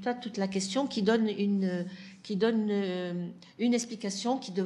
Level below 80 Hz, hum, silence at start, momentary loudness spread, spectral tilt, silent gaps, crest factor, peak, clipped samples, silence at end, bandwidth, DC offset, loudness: -76 dBFS; none; 0 s; 9 LU; -5 dB/octave; none; 18 dB; -14 dBFS; under 0.1%; 0 s; 11.5 kHz; under 0.1%; -30 LUFS